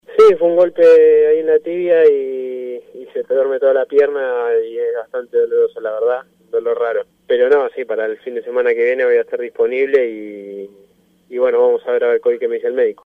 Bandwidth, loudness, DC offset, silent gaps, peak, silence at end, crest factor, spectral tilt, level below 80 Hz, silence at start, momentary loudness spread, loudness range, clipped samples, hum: 5 kHz; -15 LUFS; under 0.1%; none; -2 dBFS; 0.1 s; 12 dB; -5.5 dB/octave; -64 dBFS; 0.1 s; 14 LU; 5 LU; under 0.1%; none